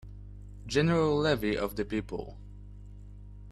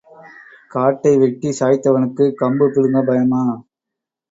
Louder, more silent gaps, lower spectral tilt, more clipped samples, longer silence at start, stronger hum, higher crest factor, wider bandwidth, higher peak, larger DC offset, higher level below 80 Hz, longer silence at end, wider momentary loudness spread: second, -29 LUFS vs -16 LUFS; neither; second, -6 dB/octave vs -7.5 dB/octave; neither; second, 0.05 s vs 0.75 s; first, 50 Hz at -45 dBFS vs none; about the same, 18 dB vs 14 dB; first, 13.5 kHz vs 8 kHz; second, -14 dBFS vs -2 dBFS; neither; first, -46 dBFS vs -60 dBFS; second, 0 s vs 0.7 s; first, 24 LU vs 5 LU